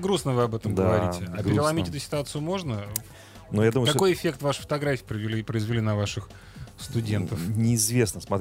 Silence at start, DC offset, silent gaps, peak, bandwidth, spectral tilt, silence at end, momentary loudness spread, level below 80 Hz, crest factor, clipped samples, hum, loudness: 0 s; under 0.1%; none; -6 dBFS; 16 kHz; -5 dB/octave; 0 s; 10 LU; -50 dBFS; 20 dB; under 0.1%; none; -26 LUFS